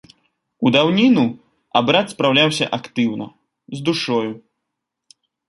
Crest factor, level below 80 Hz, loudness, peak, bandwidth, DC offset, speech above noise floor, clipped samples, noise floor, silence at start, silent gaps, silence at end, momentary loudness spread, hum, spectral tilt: 20 dB; -62 dBFS; -18 LUFS; 0 dBFS; 11.5 kHz; under 0.1%; 62 dB; under 0.1%; -79 dBFS; 0.6 s; none; 1.1 s; 15 LU; none; -5 dB/octave